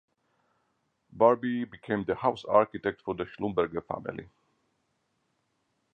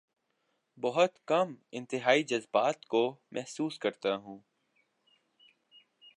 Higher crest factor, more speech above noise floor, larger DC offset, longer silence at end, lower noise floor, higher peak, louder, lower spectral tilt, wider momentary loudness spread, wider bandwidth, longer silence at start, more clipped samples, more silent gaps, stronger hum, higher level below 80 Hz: about the same, 22 dB vs 24 dB; about the same, 48 dB vs 47 dB; neither; about the same, 1.7 s vs 1.8 s; about the same, -76 dBFS vs -78 dBFS; about the same, -8 dBFS vs -10 dBFS; about the same, -29 LUFS vs -31 LUFS; first, -8 dB/octave vs -4.5 dB/octave; about the same, 12 LU vs 13 LU; second, 7 kHz vs 11 kHz; first, 1.15 s vs 0.8 s; neither; neither; neither; first, -62 dBFS vs -86 dBFS